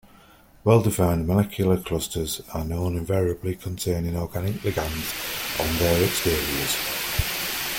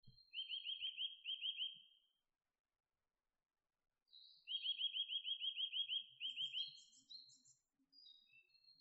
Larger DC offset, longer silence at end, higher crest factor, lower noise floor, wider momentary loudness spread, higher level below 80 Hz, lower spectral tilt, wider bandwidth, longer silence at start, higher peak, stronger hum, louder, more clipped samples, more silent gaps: neither; about the same, 0 s vs 0.1 s; about the same, 18 dB vs 16 dB; second, -52 dBFS vs under -90 dBFS; second, 8 LU vs 22 LU; first, -42 dBFS vs under -90 dBFS; first, -4.5 dB/octave vs 4.5 dB/octave; first, 17 kHz vs 7.6 kHz; first, 0.65 s vs 0.05 s; first, -6 dBFS vs -34 dBFS; neither; first, -24 LUFS vs -44 LUFS; neither; second, none vs 2.60-2.64 s